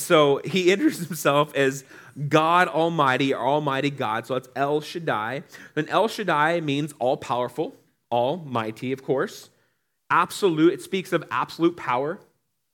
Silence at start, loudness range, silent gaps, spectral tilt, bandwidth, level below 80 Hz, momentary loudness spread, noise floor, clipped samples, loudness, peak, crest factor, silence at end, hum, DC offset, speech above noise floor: 0 s; 5 LU; none; -5 dB/octave; 18 kHz; -76 dBFS; 11 LU; -71 dBFS; under 0.1%; -23 LUFS; -4 dBFS; 20 dB; 0.55 s; none; under 0.1%; 48 dB